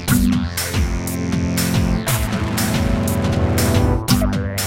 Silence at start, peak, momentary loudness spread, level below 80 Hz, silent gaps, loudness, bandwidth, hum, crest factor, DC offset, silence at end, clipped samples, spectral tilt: 0 s; -2 dBFS; 4 LU; -26 dBFS; none; -19 LUFS; 17 kHz; none; 16 dB; under 0.1%; 0 s; under 0.1%; -5 dB/octave